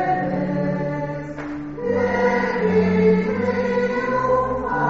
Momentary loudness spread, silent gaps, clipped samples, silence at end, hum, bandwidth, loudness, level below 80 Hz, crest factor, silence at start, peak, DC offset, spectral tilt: 11 LU; none; under 0.1%; 0 s; none; 7.2 kHz; -21 LUFS; -46 dBFS; 14 dB; 0 s; -6 dBFS; under 0.1%; -6.5 dB/octave